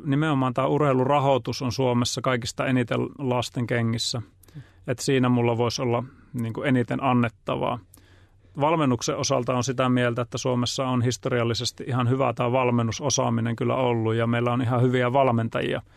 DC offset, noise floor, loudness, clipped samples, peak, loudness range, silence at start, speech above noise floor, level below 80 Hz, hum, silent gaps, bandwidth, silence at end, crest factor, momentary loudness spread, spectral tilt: under 0.1%; -54 dBFS; -24 LUFS; under 0.1%; -8 dBFS; 3 LU; 0 s; 30 dB; -58 dBFS; none; none; 13.5 kHz; 0.15 s; 16 dB; 6 LU; -5.5 dB/octave